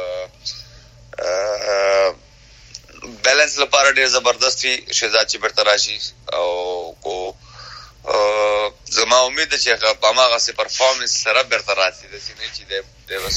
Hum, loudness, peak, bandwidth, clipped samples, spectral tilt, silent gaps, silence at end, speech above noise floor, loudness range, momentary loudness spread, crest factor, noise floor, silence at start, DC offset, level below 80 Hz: none; -17 LUFS; 0 dBFS; 16 kHz; under 0.1%; 0 dB/octave; none; 0 s; 28 dB; 5 LU; 16 LU; 18 dB; -46 dBFS; 0 s; under 0.1%; -50 dBFS